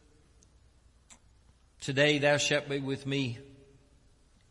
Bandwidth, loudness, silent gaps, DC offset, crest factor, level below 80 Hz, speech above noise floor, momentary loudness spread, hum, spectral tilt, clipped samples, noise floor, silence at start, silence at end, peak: 11.5 kHz; -29 LUFS; none; under 0.1%; 20 dB; -64 dBFS; 34 dB; 13 LU; none; -4 dB/octave; under 0.1%; -63 dBFS; 1.1 s; 1.05 s; -14 dBFS